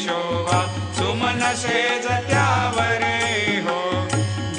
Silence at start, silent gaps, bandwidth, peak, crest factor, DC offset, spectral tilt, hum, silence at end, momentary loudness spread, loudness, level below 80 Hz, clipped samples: 0 s; none; 10 kHz; -6 dBFS; 16 dB; under 0.1%; -4 dB/octave; none; 0 s; 4 LU; -21 LUFS; -50 dBFS; under 0.1%